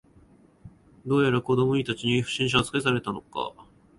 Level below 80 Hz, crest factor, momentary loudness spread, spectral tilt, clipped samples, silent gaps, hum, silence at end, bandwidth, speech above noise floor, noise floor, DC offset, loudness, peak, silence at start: -54 dBFS; 20 dB; 11 LU; -5.5 dB/octave; under 0.1%; none; none; 0.35 s; 11.5 kHz; 31 dB; -56 dBFS; under 0.1%; -25 LUFS; -8 dBFS; 0.65 s